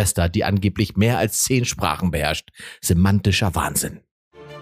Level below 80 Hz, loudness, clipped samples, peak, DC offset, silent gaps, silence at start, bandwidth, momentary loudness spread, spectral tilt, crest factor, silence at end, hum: -38 dBFS; -20 LUFS; under 0.1%; -2 dBFS; under 0.1%; 4.11-4.31 s; 0 s; 15.5 kHz; 7 LU; -4.5 dB/octave; 18 dB; 0 s; none